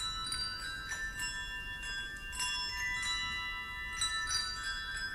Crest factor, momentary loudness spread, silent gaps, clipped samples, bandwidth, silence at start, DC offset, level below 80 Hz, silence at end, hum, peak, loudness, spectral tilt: 16 dB; 6 LU; none; under 0.1%; 16 kHz; 0 s; under 0.1%; -50 dBFS; 0 s; none; -22 dBFS; -36 LUFS; 0 dB/octave